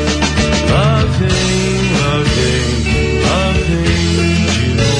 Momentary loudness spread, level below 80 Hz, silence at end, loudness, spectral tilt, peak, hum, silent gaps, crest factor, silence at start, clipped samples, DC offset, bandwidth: 2 LU; -22 dBFS; 0 s; -13 LUFS; -5 dB/octave; -2 dBFS; none; none; 12 dB; 0 s; under 0.1%; under 0.1%; 10.5 kHz